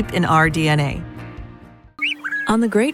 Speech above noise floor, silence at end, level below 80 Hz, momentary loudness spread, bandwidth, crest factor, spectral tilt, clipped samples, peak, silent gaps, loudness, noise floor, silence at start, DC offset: 25 dB; 0 s; -40 dBFS; 20 LU; 15.5 kHz; 18 dB; -5.5 dB/octave; under 0.1%; -2 dBFS; none; -18 LUFS; -43 dBFS; 0 s; under 0.1%